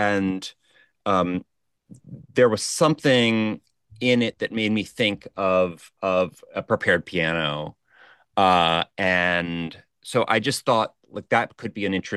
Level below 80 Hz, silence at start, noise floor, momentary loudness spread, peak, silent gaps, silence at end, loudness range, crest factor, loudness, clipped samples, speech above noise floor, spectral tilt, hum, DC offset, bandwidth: -58 dBFS; 0 s; -54 dBFS; 13 LU; -4 dBFS; none; 0 s; 2 LU; 18 dB; -23 LUFS; under 0.1%; 32 dB; -4.5 dB/octave; none; under 0.1%; 12.5 kHz